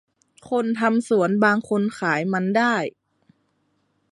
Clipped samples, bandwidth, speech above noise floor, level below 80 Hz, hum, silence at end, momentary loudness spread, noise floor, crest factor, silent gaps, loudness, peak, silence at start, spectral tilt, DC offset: under 0.1%; 11.5 kHz; 48 dB; -70 dBFS; none; 1.25 s; 7 LU; -69 dBFS; 18 dB; none; -21 LUFS; -4 dBFS; 0.45 s; -6 dB/octave; under 0.1%